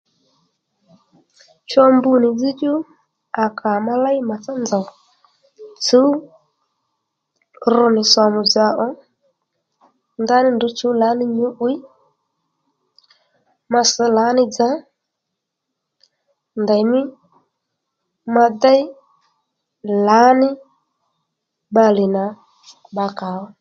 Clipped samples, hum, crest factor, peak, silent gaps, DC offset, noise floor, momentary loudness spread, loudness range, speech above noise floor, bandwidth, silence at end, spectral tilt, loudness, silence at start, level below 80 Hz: under 0.1%; none; 18 dB; 0 dBFS; none; under 0.1%; -79 dBFS; 15 LU; 5 LU; 63 dB; 7.8 kHz; 0.15 s; -4 dB/octave; -16 LUFS; 1.7 s; -70 dBFS